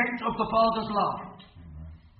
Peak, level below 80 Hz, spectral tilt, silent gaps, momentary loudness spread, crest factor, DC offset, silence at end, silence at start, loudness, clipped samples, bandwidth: -12 dBFS; -50 dBFS; -9.5 dB/octave; none; 22 LU; 18 dB; under 0.1%; 0.15 s; 0 s; -27 LUFS; under 0.1%; 5.6 kHz